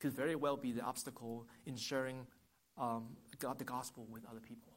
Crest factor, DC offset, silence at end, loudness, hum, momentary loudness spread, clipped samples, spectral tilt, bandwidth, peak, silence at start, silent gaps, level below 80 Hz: 20 dB; under 0.1%; 0 s; -43 LUFS; none; 15 LU; under 0.1%; -4.5 dB/octave; 16.5 kHz; -24 dBFS; 0 s; none; -78 dBFS